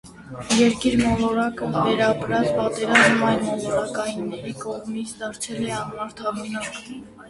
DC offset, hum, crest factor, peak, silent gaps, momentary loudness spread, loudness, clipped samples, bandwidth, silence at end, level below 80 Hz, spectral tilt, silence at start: under 0.1%; none; 22 dB; 0 dBFS; none; 14 LU; -22 LUFS; under 0.1%; 11.5 kHz; 0 s; -48 dBFS; -4.5 dB/octave; 0.05 s